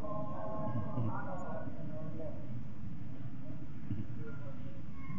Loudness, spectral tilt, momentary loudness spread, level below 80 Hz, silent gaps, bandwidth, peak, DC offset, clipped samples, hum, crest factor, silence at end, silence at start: -43 LUFS; -9 dB/octave; 9 LU; -58 dBFS; none; 7.4 kHz; -24 dBFS; 2%; under 0.1%; none; 18 dB; 0 s; 0 s